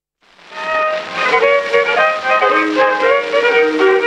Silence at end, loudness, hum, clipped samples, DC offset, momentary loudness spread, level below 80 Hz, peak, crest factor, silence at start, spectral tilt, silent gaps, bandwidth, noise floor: 0 s; -13 LUFS; none; under 0.1%; under 0.1%; 6 LU; -58 dBFS; 0 dBFS; 14 dB; 0.5 s; -3 dB/octave; none; 9.6 kHz; -47 dBFS